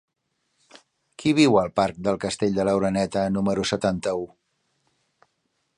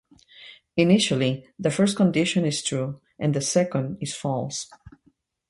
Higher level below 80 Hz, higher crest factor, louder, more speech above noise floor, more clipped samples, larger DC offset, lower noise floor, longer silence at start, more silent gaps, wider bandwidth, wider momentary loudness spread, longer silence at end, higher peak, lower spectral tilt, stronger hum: first, -54 dBFS vs -60 dBFS; about the same, 20 dB vs 18 dB; about the same, -23 LUFS vs -24 LUFS; first, 52 dB vs 42 dB; neither; neither; first, -74 dBFS vs -65 dBFS; first, 1.2 s vs 0.4 s; neither; about the same, 11 kHz vs 11.5 kHz; about the same, 9 LU vs 11 LU; first, 1.5 s vs 0.6 s; about the same, -4 dBFS vs -6 dBFS; about the same, -5.5 dB/octave vs -5 dB/octave; neither